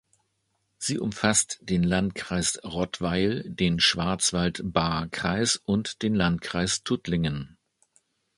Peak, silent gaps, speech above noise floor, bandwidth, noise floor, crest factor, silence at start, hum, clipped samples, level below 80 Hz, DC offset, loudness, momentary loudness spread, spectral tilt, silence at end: -6 dBFS; none; 49 dB; 11.5 kHz; -75 dBFS; 22 dB; 0.8 s; none; under 0.1%; -48 dBFS; under 0.1%; -26 LUFS; 7 LU; -4 dB/octave; 0.9 s